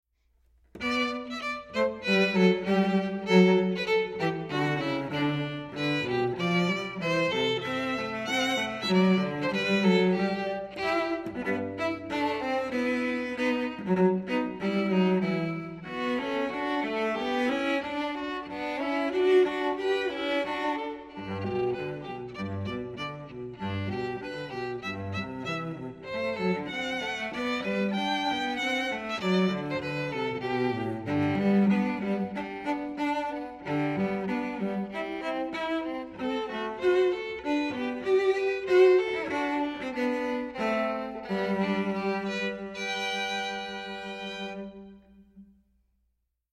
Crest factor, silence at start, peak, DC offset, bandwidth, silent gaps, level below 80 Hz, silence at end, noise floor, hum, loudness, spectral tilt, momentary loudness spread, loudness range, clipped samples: 20 dB; 0.75 s; -8 dBFS; under 0.1%; 12.5 kHz; none; -62 dBFS; 1.1 s; -77 dBFS; none; -29 LUFS; -6 dB/octave; 11 LU; 8 LU; under 0.1%